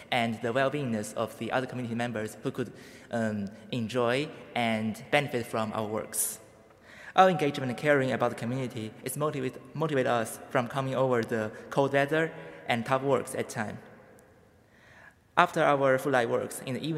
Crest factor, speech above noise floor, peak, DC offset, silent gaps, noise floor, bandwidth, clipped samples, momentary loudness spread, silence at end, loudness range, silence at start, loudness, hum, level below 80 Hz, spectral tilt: 26 dB; 30 dB; -4 dBFS; under 0.1%; none; -59 dBFS; 16 kHz; under 0.1%; 11 LU; 0 s; 4 LU; 0 s; -29 LUFS; none; -70 dBFS; -5 dB/octave